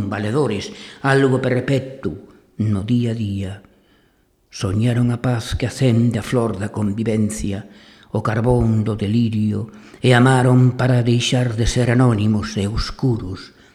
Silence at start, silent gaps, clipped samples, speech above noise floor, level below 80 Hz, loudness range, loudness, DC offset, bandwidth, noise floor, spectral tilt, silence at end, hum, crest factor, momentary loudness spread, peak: 0 s; none; under 0.1%; 41 dB; -38 dBFS; 6 LU; -19 LUFS; under 0.1%; 12.5 kHz; -59 dBFS; -6.5 dB/octave; 0.25 s; none; 18 dB; 12 LU; 0 dBFS